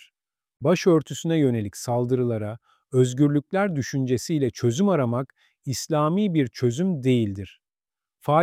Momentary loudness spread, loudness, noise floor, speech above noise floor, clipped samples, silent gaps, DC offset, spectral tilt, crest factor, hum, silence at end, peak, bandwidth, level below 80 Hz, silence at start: 10 LU; -23 LUFS; under -90 dBFS; over 67 dB; under 0.1%; none; under 0.1%; -6.5 dB/octave; 16 dB; none; 0 s; -6 dBFS; 15.5 kHz; -62 dBFS; 0.6 s